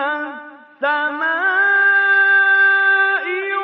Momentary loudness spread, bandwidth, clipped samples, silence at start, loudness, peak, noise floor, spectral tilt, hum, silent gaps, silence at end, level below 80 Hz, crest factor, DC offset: 11 LU; 5 kHz; under 0.1%; 0 s; -14 LUFS; -6 dBFS; -37 dBFS; 3.5 dB/octave; none; none; 0 s; -82 dBFS; 10 dB; under 0.1%